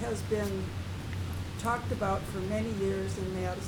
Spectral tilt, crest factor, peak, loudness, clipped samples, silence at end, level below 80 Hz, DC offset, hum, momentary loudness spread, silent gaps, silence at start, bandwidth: -6 dB/octave; 14 dB; -18 dBFS; -33 LUFS; under 0.1%; 0 s; -46 dBFS; under 0.1%; none; 6 LU; none; 0 s; 19.5 kHz